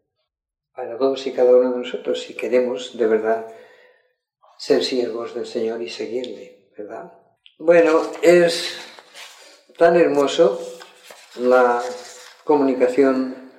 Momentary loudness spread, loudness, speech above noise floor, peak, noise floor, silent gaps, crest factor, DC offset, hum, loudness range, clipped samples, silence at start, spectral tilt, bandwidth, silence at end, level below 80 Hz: 22 LU; -19 LUFS; 65 dB; -2 dBFS; -84 dBFS; none; 18 dB; under 0.1%; none; 8 LU; under 0.1%; 0.8 s; -4.5 dB/octave; 12.5 kHz; 0.1 s; -74 dBFS